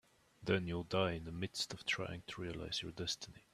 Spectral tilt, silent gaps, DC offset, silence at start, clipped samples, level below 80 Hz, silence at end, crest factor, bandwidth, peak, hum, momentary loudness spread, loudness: -4 dB/octave; none; under 0.1%; 0.4 s; under 0.1%; -64 dBFS; 0.15 s; 22 dB; 14.5 kHz; -18 dBFS; none; 8 LU; -40 LUFS